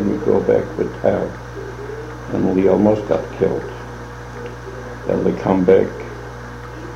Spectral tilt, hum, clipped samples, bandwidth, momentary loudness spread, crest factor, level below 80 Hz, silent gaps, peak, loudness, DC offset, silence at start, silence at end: -8 dB/octave; 60 Hz at -35 dBFS; under 0.1%; 10 kHz; 18 LU; 18 dB; -40 dBFS; none; 0 dBFS; -18 LUFS; under 0.1%; 0 s; 0 s